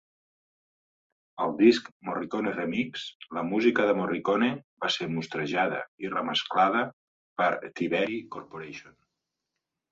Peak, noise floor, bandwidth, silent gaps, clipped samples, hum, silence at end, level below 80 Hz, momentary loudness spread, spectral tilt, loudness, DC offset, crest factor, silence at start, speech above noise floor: -8 dBFS; -85 dBFS; 7.8 kHz; 1.92-2.00 s, 3.15-3.20 s, 4.64-4.77 s, 5.88-5.98 s, 6.93-7.36 s; under 0.1%; none; 1.05 s; -72 dBFS; 16 LU; -5.5 dB/octave; -28 LUFS; under 0.1%; 22 dB; 1.35 s; 58 dB